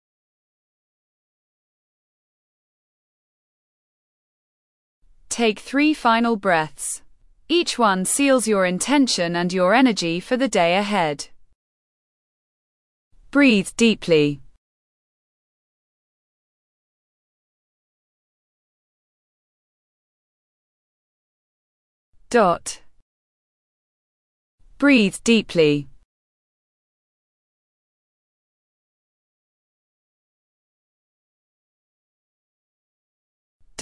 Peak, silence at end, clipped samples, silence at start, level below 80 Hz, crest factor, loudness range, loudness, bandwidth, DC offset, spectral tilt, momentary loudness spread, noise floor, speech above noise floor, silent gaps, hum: -4 dBFS; 0 s; under 0.1%; 5.3 s; -58 dBFS; 20 dB; 8 LU; -19 LUFS; 12 kHz; under 0.1%; -4 dB/octave; 10 LU; under -90 dBFS; over 71 dB; 11.55-13.11 s, 14.57-22.13 s, 23.02-24.58 s, 26.05-33.60 s; none